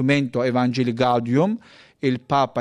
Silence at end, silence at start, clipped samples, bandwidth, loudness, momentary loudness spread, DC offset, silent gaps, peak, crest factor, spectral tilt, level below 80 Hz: 0 s; 0 s; under 0.1%; 10 kHz; -21 LUFS; 5 LU; under 0.1%; none; -6 dBFS; 16 dB; -7 dB/octave; -62 dBFS